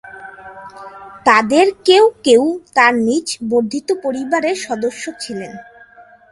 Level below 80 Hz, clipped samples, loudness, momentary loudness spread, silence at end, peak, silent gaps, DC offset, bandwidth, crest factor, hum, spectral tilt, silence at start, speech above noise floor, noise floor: -58 dBFS; under 0.1%; -15 LUFS; 23 LU; 0.7 s; 0 dBFS; none; under 0.1%; 11.5 kHz; 16 dB; none; -3 dB/octave; 0.05 s; 29 dB; -44 dBFS